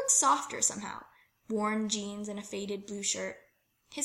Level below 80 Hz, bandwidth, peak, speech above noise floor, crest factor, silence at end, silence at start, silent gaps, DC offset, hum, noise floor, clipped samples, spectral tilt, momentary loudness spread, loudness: -72 dBFS; 16.5 kHz; -14 dBFS; 32 dB; 20 dB; 0 s; 0 s; none; under 0.1%; none; -65 dBFS; under 0.1%; -2 dB/octave; 16 LU; -31 LUFS